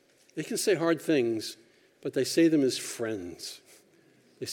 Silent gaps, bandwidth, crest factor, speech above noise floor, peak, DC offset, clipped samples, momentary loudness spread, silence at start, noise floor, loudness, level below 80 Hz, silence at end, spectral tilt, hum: none; 17.5 kHz; 16 dB; 34 dB; -14 dBFS; under 0.1%; under 0.1%; 17 LU; 0.35 s; -62 dBFS; -28 LUFS; -76 dBFS; 0 s; -4 dB/octave; none